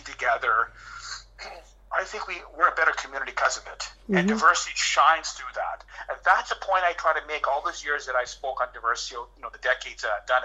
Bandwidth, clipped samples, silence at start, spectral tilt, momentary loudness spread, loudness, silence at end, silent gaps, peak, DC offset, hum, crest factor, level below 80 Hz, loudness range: 8.4 kHz; under 0.1%; 0 s; -2.5 dB/octave; 17 LU; -25 LUFS; 0 s; none; -4 dBFS; under 0.1%; none; 22 dB; -54 dBFS; 5 LU